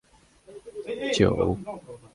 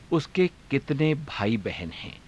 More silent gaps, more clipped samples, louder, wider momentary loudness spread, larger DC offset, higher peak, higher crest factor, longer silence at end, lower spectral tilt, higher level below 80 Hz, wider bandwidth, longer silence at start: neither; neither; about the same, -25 LUFS vs -27 LUFS; first, 19 LU vs 9 LU; neither; first, -6 dBFS vs -12 dBFS; first, 22 dB vs 16 dB; about the same, 0.2 s vs 0.1 s; second, -5.5 dB/octave vs -7 dB/octave; first, -46 dBFS vs -52 dBFS; about the same, 11.5 kHz vs 11 kHz; first, 0.5 s vs 0 s